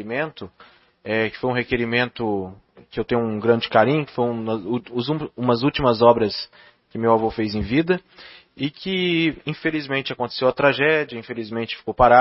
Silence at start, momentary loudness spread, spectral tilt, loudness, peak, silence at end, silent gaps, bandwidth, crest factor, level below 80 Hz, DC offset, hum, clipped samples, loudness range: 0 s; 12 LU; -10 dB/octave; -21 LUFS; 0 dBFS; 0 s; none; 5.8 kHz; 22 dB; -46 dBFS; under 0.1%; none; under 0.1%; 3 LU